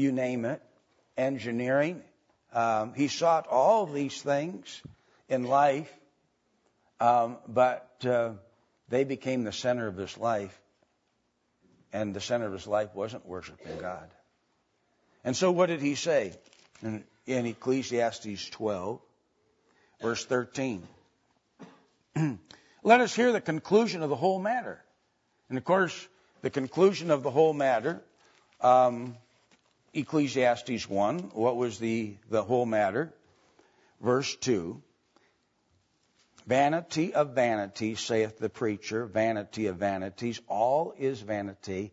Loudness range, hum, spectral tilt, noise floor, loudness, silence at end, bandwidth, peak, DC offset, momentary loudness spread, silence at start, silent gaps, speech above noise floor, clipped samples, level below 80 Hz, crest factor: 8 LU; none; -5 dB/octave; -75 dBFS; -29 LUFS; 0.05 s; 8 kHz; -8 dBFS; under 0.1%; 14 LU; 0 s; none; 47 dB; under 0.1%; -72 dBFS; 22 dB